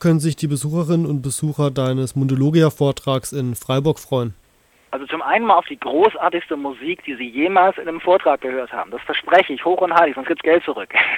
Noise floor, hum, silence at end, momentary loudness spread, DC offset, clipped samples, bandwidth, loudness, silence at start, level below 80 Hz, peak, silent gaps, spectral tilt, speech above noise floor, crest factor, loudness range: -56 dBFS; none; 0 s; 10 LU; under 0.1%; under 0.1%; 17 kHz; -19 LUFS; 0 s; -54 dBFS; 0 dBFS; none; -6 dB/octave; 38 dB; 18 dB; 3 LU